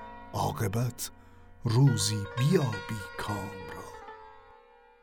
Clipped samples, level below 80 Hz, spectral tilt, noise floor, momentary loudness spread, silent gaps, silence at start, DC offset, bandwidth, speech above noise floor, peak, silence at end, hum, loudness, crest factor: under 0.1%; -54 dBFS; -5.5 dB/octave; -57 dBFS; 19 LU; none; 0 s; under 0.1%; 17.5 kHz; 29 dB; -12 dBFS; 0.65 s; none; -30 LUFS; 18 dB